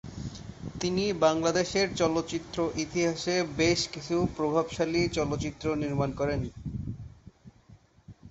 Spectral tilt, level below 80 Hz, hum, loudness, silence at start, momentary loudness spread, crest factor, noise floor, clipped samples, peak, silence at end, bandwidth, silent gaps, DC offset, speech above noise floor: -5 dB/octave; -50 dBFS; none; -29 LUFS; 0.05 s; 15 LU; 20 dB; -57 dBFS; under 0.1%; -10 dBFS; 0 s; 8.2 kHz; none; under 0.1%; 29 dB